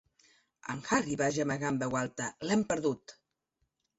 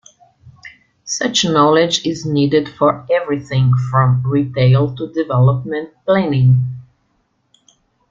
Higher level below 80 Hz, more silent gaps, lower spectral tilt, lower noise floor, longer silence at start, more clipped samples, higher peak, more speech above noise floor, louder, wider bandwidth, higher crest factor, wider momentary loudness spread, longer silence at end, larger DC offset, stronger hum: second, -66 dBFS vs -52 dBFS; neither; second, -4.5 dB/octave vs -6 dB/octave; first, -81 dBFS vs -63 dBFS; first, 0.65 s vs 0.45 s; neither; second, -14 dBFS vs -2 dBFS; about the same, 49 dB vs 49 dB; second, -32 LUFS vs -15 LUFS; about the same, 8.2 kHz vs 7.6 kHz; first, 20 dB vs 14 dB; about the same, 11 LU vs 10 LU; second, 0.85 s vs 1.3 s; neither; neither